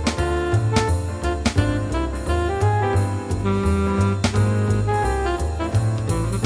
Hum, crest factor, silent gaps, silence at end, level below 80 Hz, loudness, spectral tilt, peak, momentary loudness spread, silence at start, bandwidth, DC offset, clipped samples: none; 16 dB; none; 0 s; -30 dBFS; -21 LUFS; -6.5 dB/octave; -4 dBFS; 4 LU; 0 s; 11 kHz; under 0.1%; under 0.1%